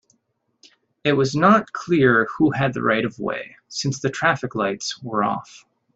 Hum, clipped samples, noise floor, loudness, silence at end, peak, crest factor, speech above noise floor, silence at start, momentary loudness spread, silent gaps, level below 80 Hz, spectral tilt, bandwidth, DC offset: none; under 0.1%; -70 dBFS; -21 LUFS; 0.4 s; -2 dBFS; 20 dB; 50 dB; 1.05 s; 12 LU; none; -58 dBFS; -5.5 dB/octave; 8.2 kHz; under 0.1%